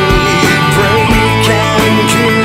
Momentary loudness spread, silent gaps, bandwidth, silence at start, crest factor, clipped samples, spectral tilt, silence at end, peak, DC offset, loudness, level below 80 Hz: 1 LU; none; 16.5 kHz; 0 s; 10 dB; under 0.1%; -4.5 dB/octave; 0 s; 0 dBFS; under 0.1%; -9 LUFS; -24 dBFS